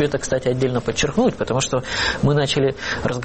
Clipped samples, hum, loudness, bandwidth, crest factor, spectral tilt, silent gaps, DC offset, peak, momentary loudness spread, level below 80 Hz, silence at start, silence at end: under 0.1%; none; -20 LUFS; 8.8 kHz; 12 dB; -4.5 dB/octave; none; under 0.1%; -8 dBFS; 4 LU; -40 dBFS; 0 s; 0 s